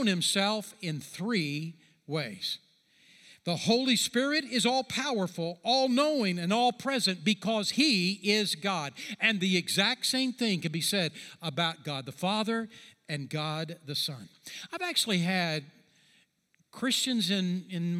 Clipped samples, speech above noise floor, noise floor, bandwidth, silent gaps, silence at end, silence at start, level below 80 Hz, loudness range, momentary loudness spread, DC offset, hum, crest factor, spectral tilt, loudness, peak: under 0.1%; 42 dB; -72 dBFS; 15.5 kHz; none; 0 s; 0 s; -80 dBFS; 6 LU; 11 LU; under 0.1%; none; 20 dB; -3.5 dB/octave; -29 LUFS; -10 dBFS